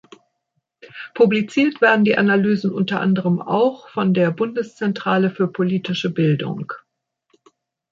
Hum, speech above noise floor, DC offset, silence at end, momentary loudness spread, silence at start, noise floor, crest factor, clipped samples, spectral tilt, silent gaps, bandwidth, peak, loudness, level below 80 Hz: none; 55 dB; under 0.1%; 1.15 s; 9 LU; 0.95 s; -74 dBFS; 18 dB; under 0.1%; -7.5 dB/octave; none; 7.4 kHz; -2 dBFS; -19 LUFS; -66 dBFS